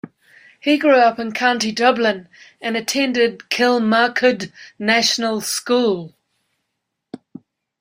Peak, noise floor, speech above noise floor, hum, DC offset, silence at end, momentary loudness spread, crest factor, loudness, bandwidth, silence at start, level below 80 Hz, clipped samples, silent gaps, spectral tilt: -2 dBFS; -77 dBFS; 59 dB; none; under 0.1%; 0.65 s; 12 LU; 18 dB; -17 LUFS; 16 kHz; 0.05 s; -66 dBFS; under 0.1%; none; -3 dB/octave